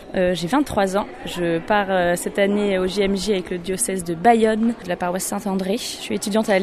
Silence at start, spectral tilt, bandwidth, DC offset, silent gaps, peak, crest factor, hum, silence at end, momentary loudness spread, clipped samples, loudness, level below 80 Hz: 0 s; -4.5 dB/octave; 15 kHz; under 0.1%; none; -2 dBFS; 18 dB; none; 0 s; 8 LU; under 0.1%; -21 LUFS; -44 dBFS